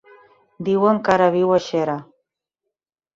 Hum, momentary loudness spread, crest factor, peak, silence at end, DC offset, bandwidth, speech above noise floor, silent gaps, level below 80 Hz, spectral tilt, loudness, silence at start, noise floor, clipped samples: none; 11 LU; 18 dB; -4 dBFS; 1.1 s; under 0.1%; 7.6 kHz; 64 dB; none; -60 dBFS; -6.5 dB/octave; -19 LUFS; 0.6 s; -82 dBFS; under 0.1%